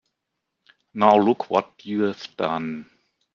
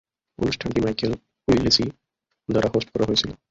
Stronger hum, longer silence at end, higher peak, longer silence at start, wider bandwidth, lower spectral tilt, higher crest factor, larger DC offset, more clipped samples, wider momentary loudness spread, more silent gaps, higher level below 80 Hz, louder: neither; first, 0.5 s vs 0.15 s; first, 0 dBFS vs -4 dBFS; first, 0.95 s vs 0.4 s; second, 7.2 kHz vs 8 kHz; first, -7 dB/octave vs -5 dB/octave; about the same, 22 dB vs 20 dB; neither; neither; first, 15 LU vs 10 LU; neither; second, -68 dBFS vs -44 dBFS; about the same, -22 LUFS vs -23 LUFS